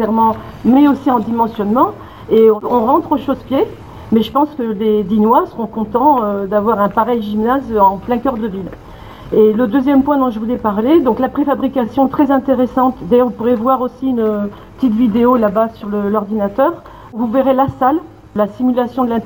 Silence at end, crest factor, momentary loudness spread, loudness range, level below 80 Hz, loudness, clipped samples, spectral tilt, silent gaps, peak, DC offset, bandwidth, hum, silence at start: 0 s; 14 dB; 8 LU; 2 LU; -42 dBFS; -14 LUFS; under 0.1%; -8.5 dB/octave; none; 0 dBFS; 0.2%; 18 kHz; none; 0 s